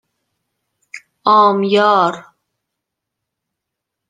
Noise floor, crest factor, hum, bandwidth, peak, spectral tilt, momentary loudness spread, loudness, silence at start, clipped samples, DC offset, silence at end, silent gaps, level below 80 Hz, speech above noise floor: -80 dBFS; 18 dB; none; 9.4 kHz; 0 dBFS; -5.5 dB/octave; 9 LU; -13 LUFS; 0.95 s; under 0.1%; under 0.1%; 1.9 s; none; -70 dBFS; 67 dB